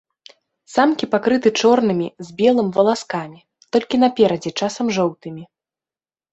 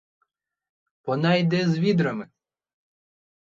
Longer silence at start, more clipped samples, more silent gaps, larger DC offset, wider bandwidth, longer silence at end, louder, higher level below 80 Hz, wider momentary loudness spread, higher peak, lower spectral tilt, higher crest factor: second, 0.7 s vs 1.05 s; neither; neither; neither; first, 8.2 kHz vs 7.4 kHz; second, 0.9 s vs 1.35 s; first, -18 LUFS vs -23 LUFS; first, -62 dBFS vs -68 dBFS; about the same, 12 LU vs 12 LU; first, -2 dBFS vs -8 dBFS; second, -5 dB/octave vs -7.5 dB/octave; about the same, 18 dB vs 18 dB